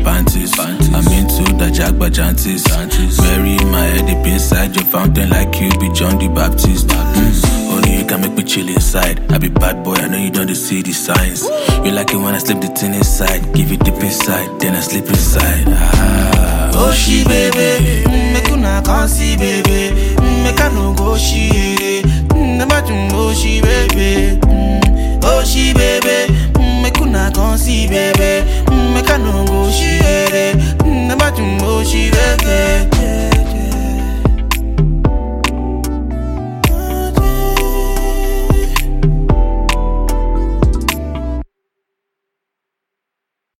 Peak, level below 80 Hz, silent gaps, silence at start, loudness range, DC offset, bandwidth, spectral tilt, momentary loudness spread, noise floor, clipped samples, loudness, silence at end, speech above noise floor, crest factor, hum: 0 dBFS; -14 dBFS; none; 0 s; 4 LU; under 0.1%; 17 kHz; -4.5 dB/octave; 5 LU; -79 dBFS; under 0.1%; -13 LUFS; 2.15 s; 68 dB; 12 dB; none